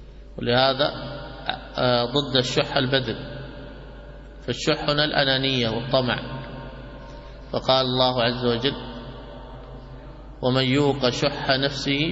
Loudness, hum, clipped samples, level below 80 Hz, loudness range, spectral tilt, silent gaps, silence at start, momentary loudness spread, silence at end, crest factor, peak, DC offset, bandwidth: -22 LUFS; none; under 0.1%; -42 dBFS; 2 LU; -5 dB/octave; none; 0 s; 21 LU; 0 s; 20 dB; -4 dBFS; under 0.1%; 8 kHz